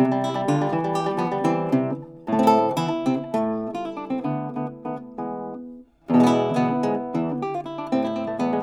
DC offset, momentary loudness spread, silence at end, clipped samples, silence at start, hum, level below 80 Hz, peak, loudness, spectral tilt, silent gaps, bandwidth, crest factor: under 0.1%; 13 LU; 0 s; under 0.1%; 0 s; none; -62 dBFS; -4 dBFS; -24 LUFS; -7 dB/octave; none; 14.5 kHz; 18 dB